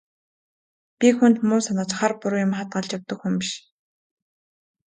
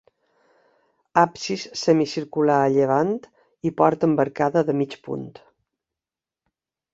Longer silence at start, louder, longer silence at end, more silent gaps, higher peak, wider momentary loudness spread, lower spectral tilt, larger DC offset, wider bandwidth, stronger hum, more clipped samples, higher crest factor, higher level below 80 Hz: second, 1 s vs 1.15 s; about the same, -22 LUFS vs -22 LUFS; second, 1.35 s vs 1.65 s; neither; about the same, -4 dBFS vs -2 dBFS; about the same, 12 LU vs 12 LU; about the same, -5 dB/octave vs -6 dB/octave; neither; first, 9.4 kHz vs 7.8 kHz; neither; neither; about the same, 20 dB vs 22 dB; about the same, -70 dBFS vs -66 dBFS